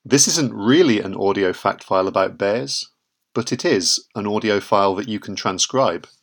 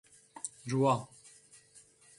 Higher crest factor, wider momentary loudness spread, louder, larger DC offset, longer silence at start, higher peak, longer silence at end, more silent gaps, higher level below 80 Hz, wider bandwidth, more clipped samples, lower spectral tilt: about the same, 20 dB vs 20 dB; second, 10 LU vs 25 LU; first, -19 LUFS vs -33 LUFS; neither; second, 0.05 s vs 0.35 s; first, 0 dBFS vs -16 dBFS; second, 0.25 s vs 1.15 s; neither; first, -66 dBFS vs -74 dBFS; first, 19 kHz vs 11.5 kHz; neither; second, -3 dB/octave vs -6 dB/octave